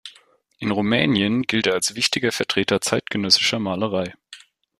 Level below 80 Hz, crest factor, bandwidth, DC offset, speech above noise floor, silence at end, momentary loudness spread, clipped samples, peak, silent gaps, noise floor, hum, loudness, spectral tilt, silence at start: -58 dBFS; 20 dB; 15 kHz; under 0.1%; 34 dB; 0.4 s; 9 LU; under 0.1%; -2 dBFS; none; -55 dBFS; none; -20 LUFS; -3.5 dB/octave; 0.05 s